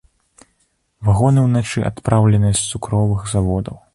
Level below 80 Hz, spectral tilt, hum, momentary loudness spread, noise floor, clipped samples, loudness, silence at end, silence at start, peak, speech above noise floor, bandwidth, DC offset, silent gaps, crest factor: -36 dBFS; -6 dB/octave; none; 8 LU; -64 dBFS; under 0.1%; -17 LUFS; 0.2 s; 1 s; 0 dBFS; 49 dB; 11.5 kHz; under 0.1%; none; 16 dB